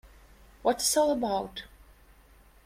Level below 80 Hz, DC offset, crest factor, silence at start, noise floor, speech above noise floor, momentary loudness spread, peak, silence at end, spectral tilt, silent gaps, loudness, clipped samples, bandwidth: -56 dBFS; under 0.1%; 20 dB; 0.05 s; -57 dBFS; 30 dB; 14 LU; -10 dBFS; 1 s; -2.5 dB/octave; none; -28 LUFS; under 0.1%; 16 kHz